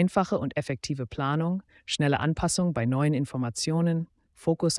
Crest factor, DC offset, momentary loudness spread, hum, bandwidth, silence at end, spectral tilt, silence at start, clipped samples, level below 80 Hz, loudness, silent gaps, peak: 16 dB; under 0.1%; 7 LU; none; 12 kHz; 0 s; -5.5 dB/octave; 0 s; under 0.1%; -52 dBFS; -28 LUFS; none; -10 dBFS